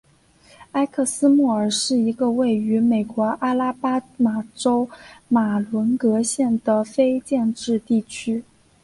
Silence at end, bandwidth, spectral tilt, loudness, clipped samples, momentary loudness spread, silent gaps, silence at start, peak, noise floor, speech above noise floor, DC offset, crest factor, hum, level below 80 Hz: 0.4 s; 11.5 kHz; -5 dB/octave; -21 LUFS; under 0.1%; 5 LU; none; 0.6 s; -6 dBFS; -54 dBFS; 34 dB; under 0.1%; 14 dB; none; -60 dBFS